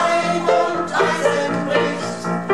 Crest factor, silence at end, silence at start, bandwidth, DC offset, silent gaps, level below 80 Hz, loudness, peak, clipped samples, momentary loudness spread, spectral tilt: 14 dB; 0 s; 0 s; 12.5 kHz; 0.6%; none; -62 dBFS; -19 LUFS; -4 dBFS; under 0.1%; 6 LU; -4.5 dB/octave